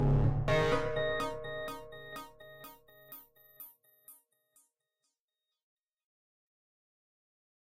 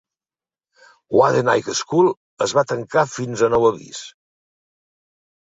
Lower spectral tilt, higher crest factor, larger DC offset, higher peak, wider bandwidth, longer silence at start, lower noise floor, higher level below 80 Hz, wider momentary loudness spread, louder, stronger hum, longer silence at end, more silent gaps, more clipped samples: first, -6.5 dB/octave vs -4.5 dB/octave; about the same, 18 dB vs 18 dB; neither; second, -18 dBFS vs -2 dBFS; first, 16 kHz vs 8 kHz; second, 0 s vs 1.1 s; about the same, under -90 dBFS vs under -90 dBFS; first, -46 dBFS vs -56 dBFS; first, 23 LU vs 14 LU; second, -33 LUFS vs -19 LUFS; neither; about the same, 1.6 s vs 1.5 s; about the same, 5.20-5.28 s, 5.63-5.77 s vs 2.17-2.37 s; neither